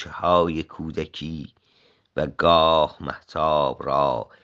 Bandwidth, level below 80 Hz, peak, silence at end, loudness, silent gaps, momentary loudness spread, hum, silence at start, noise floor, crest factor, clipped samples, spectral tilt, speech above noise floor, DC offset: 7.4 kHz; -50 dBFS; -4 dBFS; 0.2 s; -22 LUFS; none; 16 LU; none; 0 s; -61 dBFS; 20 dB; under 0.1%; -6.5 dB/octave; 39 dB; under 0.1%